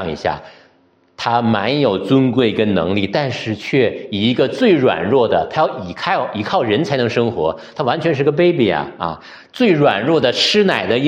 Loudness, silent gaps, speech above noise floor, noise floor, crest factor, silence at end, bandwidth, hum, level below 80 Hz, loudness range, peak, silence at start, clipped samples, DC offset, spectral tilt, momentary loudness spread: -16 LUFS; none; 39 dB; -55 dBFS; 16 dB; 0 s; 10.5 kHz; none; -52 dBFS; 2 LU; 0 dBFS; 0 s; under 0.1%; under 0.1%; -6 dB/octave; 9 LU